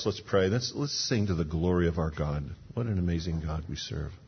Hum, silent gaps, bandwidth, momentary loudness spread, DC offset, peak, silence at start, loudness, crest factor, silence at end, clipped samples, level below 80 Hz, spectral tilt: none; none; 6.6 kHz; 8 LU; under 0.1%; -12 dBFS; 0 s; -30 LUFS; 18 dB; 0 s; under 0.1%; -42 dBFS; -5.5 dB/octave